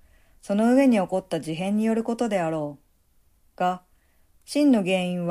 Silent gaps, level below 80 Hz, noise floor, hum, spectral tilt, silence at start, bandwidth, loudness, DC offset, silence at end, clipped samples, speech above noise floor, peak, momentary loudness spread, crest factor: none; -62 dBFS; -62 dBFS; none; -6.5 dB/octave; 0.45 s; 14 kHz; -24 LUFS; under 0.1%; 0 s; under 0.1%; 39 dB; -8 dBFS; 11 LU; 16 dB